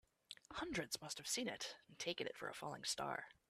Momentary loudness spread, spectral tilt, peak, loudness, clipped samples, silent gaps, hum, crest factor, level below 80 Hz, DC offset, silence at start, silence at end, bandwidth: 8 LU; -2 dB/octave; -28 dBFS; -45 LUFS; under 0.1%; none; none; 20 dB; -74 dBFS; under 0.1%; 0.3 s; 0.2 s; 15.5 kHz